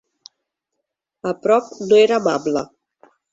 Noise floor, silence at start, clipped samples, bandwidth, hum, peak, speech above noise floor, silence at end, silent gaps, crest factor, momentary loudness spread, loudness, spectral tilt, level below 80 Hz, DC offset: -79 dBFS; 1.25 s; under 0.1%; 7.8 kHz; none; -4 dBFS; 62 dB; 0.7 s; none; 18 dB; 14 LU; -18 LUFS; -5 dB/octave; -64 dBFS; under 0.1%